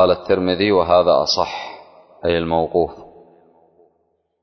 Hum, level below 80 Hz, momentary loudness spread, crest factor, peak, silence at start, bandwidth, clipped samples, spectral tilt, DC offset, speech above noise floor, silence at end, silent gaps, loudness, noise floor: none; -44 dBFS; 11 LU; 16 dB; -2 dBFS; 0 s; 6.4 kHz; under 0.1%; -5 dB/octave; under 0.1%; 50 dB; 1.35 s; none; -17 LUFS; -66 dBFS